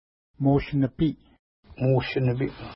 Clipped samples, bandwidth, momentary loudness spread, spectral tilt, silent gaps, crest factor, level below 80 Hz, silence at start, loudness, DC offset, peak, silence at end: under 0.1%; 5.8 kHz; 5 LU; -12 dB/octave; 1.39-1.63 s; 16 dB; -46 dBFS; 0.4 s; -25 LUFS; under 0.1%; -10 dBFS; 0 s